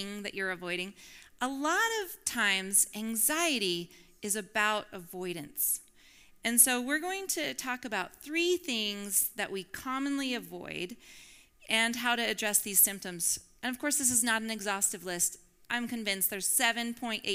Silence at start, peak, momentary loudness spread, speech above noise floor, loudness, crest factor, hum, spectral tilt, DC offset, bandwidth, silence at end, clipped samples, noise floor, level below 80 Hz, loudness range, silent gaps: 0 s; -8 dBFS; 12 LU; 27 dB; -30 LUFS; 24 dB; none; -1 dB/octave; under 0.1%; 19.5 kHz; 0 s; under 0.1%; -58 dBFS; -66 dBFS; 4 LU; none